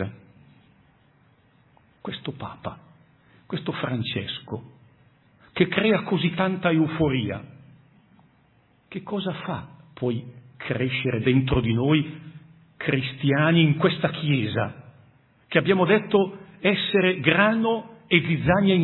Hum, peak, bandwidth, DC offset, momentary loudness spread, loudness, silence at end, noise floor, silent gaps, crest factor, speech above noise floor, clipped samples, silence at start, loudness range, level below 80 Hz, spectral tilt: none; -4 dBFS; 4.2 kHz; under 0.1%; 16 LU; -23 LUFS; 0 s; -61 dBFS; none; 22 dB; 38 dB; under 0.1%; 0 s; 11 LU; -52 dBFS; -10.5 dB/octave